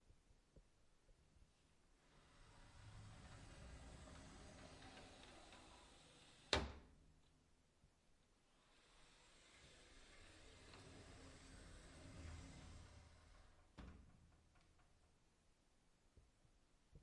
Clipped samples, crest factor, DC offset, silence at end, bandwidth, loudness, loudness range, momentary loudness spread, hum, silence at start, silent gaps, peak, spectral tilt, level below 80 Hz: under 0.1%; 38 dB; under 0.1%; 0 s; 11 kHz; -56 LUFS; 15 LU; 10 LU; none; 0 s; none; -22 dBFS; -3.5 dB/octave; -68 dBFS